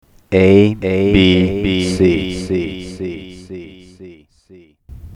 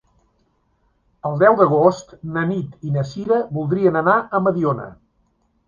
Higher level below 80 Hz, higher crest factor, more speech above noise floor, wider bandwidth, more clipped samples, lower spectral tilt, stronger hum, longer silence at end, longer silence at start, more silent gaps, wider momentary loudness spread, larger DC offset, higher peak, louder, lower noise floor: first, -36 dBFS vs -56 dBFS; about the same, 16 dB vs 18 dB; second, 33 dB vs 46 dB; first, 11 kHz vs 7.2 kHz; neither; second, -6.5 dB/octave vs -8 dB/octave; neither; second, 0 s vs 0.75 s; second, 0.3 s vs 1.25 s; neither; first, 21 LU vs 13 LU; neither; about the same, 0 dBFS vs 0 dBFS; first, -14 LUFS vs -19 LUFS; second, -46 dBFS vs -64 dBFS